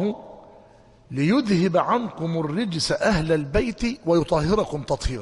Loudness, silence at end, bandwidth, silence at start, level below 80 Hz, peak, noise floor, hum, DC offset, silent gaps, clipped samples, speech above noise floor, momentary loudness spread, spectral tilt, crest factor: -23 LUFS; 0 s; 11.5 kHz; 0 s; -38 dBFS; -6 dBFS; -51 dBFS; none; under 0.1%; none; under 0.1%; 29 dB; 7 LU; -6 dB/octave; 16 dB